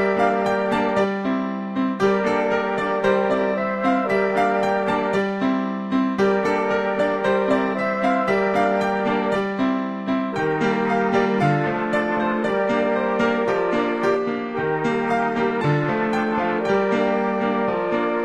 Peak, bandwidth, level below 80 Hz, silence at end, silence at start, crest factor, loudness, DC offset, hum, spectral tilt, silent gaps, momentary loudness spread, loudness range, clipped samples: -6 dBFS; 11 kHz; -56 dBFS; 0 s; 0 s; 14 dB; -21 LUFS; 0.1%; none; -7 dB/octave; none; 3 LU; 1 LU; under 0.1%